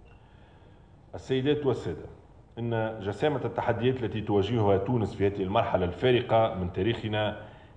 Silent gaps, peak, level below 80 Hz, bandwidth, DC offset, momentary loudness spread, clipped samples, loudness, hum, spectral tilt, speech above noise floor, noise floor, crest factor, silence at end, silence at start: none; -10 dBFS; -54 dBFS; 9.4 kHz; under 0.1%; 12 LU; under 0.1%; -28 LUFS; none; -8 dB/octave; 26 dB; -54 dBFS; 18 dB; 0.1 s; 0.1 s